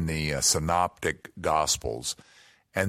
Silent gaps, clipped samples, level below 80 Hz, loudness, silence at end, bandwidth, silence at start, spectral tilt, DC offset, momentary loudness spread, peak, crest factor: none; under 0.1%; -46 dBFS; -27 LUFS; 0 s; 16.5 kHz; 0 s; -3 dB/octave; under 0.1%; 11 LU; -8 dBFS; 20 dB